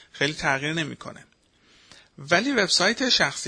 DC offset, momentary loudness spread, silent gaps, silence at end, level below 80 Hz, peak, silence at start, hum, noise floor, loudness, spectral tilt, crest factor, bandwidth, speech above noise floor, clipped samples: under 0.1%; 19 LU; none; 0 s; -58 dBFS; -6 dBFS; 0.15 s; none; -59 dBFS; -22 LUFS; -2.5 dB/octave; 20 dB; 10.5 kHz; 35 dB; under 0.1%